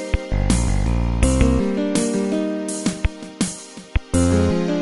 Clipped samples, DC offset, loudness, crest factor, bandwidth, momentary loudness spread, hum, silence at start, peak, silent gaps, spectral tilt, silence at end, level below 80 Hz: under 0.1%; under 0.1%; -21 LUFS; 16 dB; 11.5 kHz; 9 LU; none; 0 s; -4 dBFS; none; -5.5 dB/octave; 0 s; -24 dBFS